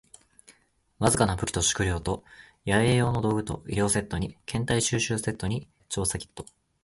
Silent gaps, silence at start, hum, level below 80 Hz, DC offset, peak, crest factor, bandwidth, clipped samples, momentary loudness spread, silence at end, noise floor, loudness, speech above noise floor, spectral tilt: none; 0.5 s; none; -44 dBFS; under 0.1%; -8 dBFS; 20 dB; 12 kHz; under 0.1%; 12 LU; 0.4 s; -64 dBFS; -27 LUFS; 37 dB; -4.5 dB/octave